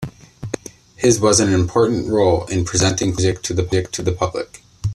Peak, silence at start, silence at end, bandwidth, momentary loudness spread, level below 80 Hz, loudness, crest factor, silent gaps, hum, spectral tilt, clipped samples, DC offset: -2 dBFS; 0 s; 0 s; 13 kHz; 16 LU; -42 dBFS; -17 LUFS; 16 dB; none; none; -4.5 dB/octave; under 0.1%; under 0.1%